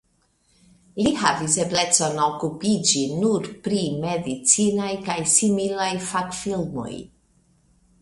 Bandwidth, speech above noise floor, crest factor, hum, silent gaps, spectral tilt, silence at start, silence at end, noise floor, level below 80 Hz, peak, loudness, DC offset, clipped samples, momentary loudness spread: 11.5 kHz; 42 dB; 22 dB; none; none; -3 dB/octave; 0.95 s; 0.95 s; -65 dBFS; -56 dBFS; 0 dBFS; -21 LUFS; under 0.1%; under 0.1%; 9 LU